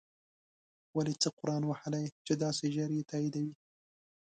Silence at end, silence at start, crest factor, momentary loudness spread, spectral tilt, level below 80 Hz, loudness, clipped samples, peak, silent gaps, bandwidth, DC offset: 0.75 s; 0.95 s; 18 dB; 6 LU; -5.5 dB/octave; -76 dBFS; -35 LUFS; under 0.1%; -18 dBFS; 1.33-1.37 s, 2.12-2.25 s; 9.4 kHz; under 0.1%